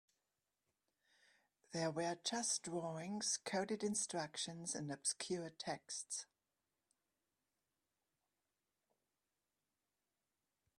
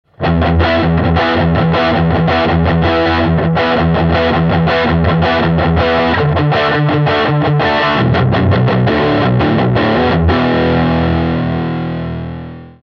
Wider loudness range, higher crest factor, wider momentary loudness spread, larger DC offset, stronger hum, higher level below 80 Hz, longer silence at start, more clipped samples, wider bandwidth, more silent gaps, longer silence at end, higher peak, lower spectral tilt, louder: first, 10 LU vs 1 LU; first, 22 dB vs 12 dB; first, 7 LU vs 4 LU; neither; first, 50 Hz at -80 dBFS vs none; second, -86 dBFS vs -26 dBFS; first, 1.7 s vs 0.2 s; neither; first, 14.5 kHz vs 6.2 kHz; neither; first, 4.55 s vs 0.15 s; second, -26 dBFS vs 0 dBFS; second, -3 dB/octave vs -8.5 dB/octave; second, -42 LUFS vs -12 LUFS